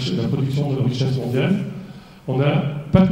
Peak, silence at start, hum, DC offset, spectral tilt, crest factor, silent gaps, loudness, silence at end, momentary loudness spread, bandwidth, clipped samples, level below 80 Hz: 0 dBFS; 0 s; none; under 0.1%; -8 dB/octave; 20 dB; none; -21 LUFS; 0 s; 13 LU; 10 kHz; under 0.1%; -44 dBFS